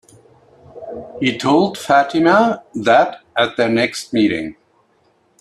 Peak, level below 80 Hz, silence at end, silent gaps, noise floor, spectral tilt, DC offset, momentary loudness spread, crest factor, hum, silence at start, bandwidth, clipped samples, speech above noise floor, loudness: 0 dBFS; -58 dBFS; 0.9 s; none; -58 dBFS; -5 dB/octave; under 0.1%; 18 LU; 18 dB; none; 0.75 s; 13 kHz; under 0.1%; 43 dB; -16 LUFS